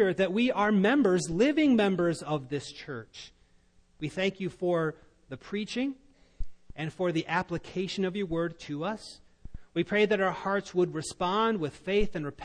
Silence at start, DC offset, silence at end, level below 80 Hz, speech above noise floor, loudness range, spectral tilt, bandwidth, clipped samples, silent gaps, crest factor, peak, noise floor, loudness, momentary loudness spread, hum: 0 s; under 0.1%; 0 s; -48 dBFS; 34 dB; 7 LU; -5.5 dB/octave; 10.5 kHz; under 0.1%; none; 16 dB; -14 dBFS; -63 dBFS; -29 LUFS; 17 LU; none